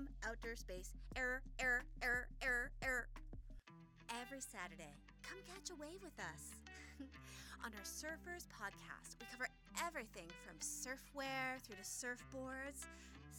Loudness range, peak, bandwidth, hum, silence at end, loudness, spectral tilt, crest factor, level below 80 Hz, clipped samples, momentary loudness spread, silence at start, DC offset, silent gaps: 10 LU; -26 dBFS; over 20 kHz; none; 0 s; -47 LUFS; -2.5 dB/octave; 24 dB; -60 dBFS; under 0.1%; 15 LU; 0 s; under 0.1%; none